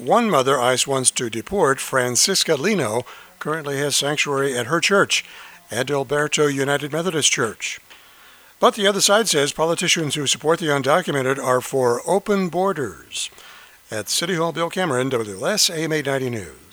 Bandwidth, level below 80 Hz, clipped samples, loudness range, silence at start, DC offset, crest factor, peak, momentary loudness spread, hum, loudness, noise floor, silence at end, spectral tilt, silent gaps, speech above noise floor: over 20 kHz; -58 dBFS; under 0.1%; 4 LU; 0 s; under 0.1%; 20 dB; -2 dBFS; 11 LU; none; -20 LUFS; -48 dBFS; 0.2 s; -3 dB/octave; none; 28 dB